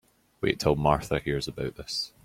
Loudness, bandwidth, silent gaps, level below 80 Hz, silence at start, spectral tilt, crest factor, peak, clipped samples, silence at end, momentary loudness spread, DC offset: -28 LUFS; 16 kHz; none; -46 dBFS; 0.4 s; -5 dB/octave; 22 dB; -8 dBFS; under 0.1%; 0.15 s; 8 LU; under 0.1%